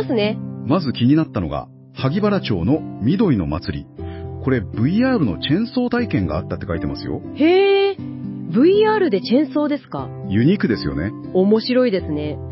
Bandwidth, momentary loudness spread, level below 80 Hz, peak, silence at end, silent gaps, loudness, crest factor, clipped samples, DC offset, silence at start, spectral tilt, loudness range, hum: 5.8 kHz; 13 LU; -40 dBFS; -4 dBFS; 0 s; none; -19 LUFS; 16 dB; under 0.1%; under 0.1%; 0 s; -11.5 dB/octave; 3 LU; none